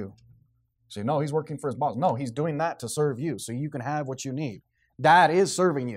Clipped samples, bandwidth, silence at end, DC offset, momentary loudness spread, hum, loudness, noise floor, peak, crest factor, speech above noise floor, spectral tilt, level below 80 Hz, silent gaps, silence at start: under 0.1%; 16 kHz; 0 s; under 0.1%; 14 LU; none; -26 LUFS; -67 dBFS; -6 dBFS; 20 dB; 42 dB; -5 dB/octave; -68 dBFS; none; 0 s